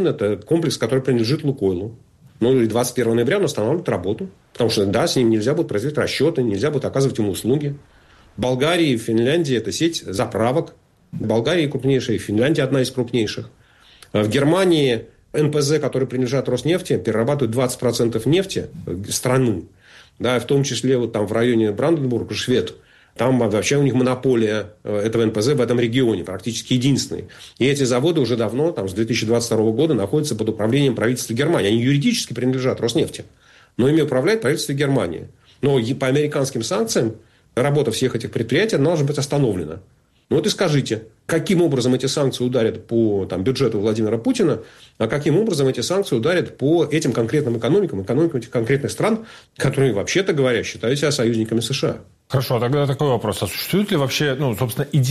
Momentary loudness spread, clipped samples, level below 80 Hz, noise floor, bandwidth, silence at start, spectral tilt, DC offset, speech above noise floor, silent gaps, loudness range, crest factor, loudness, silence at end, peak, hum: 6 LU; under 0.1%; -54 dBFS; -49 dBFS; 14.5 kHz; 0 s; -5.5 dB/octave; under 0.1%; 30 dB; none; 2 LU; 12 dB; -20 LUFS; 0 s; -6 dBFS; none